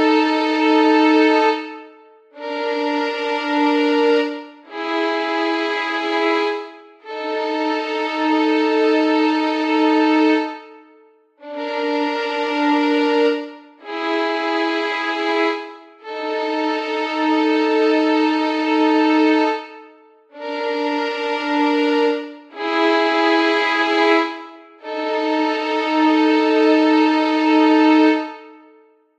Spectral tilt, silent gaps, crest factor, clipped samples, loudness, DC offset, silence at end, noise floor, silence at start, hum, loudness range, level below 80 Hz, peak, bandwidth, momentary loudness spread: -2.5 dB/octave; none; 14 dB; under 0.1%; -18 LUFS; under 0.1%; 0.65 s; -52 dBFS; 0 s; none; 5 LU; -76 dBFS; -4 dBFS; 8 kHz; 14 LU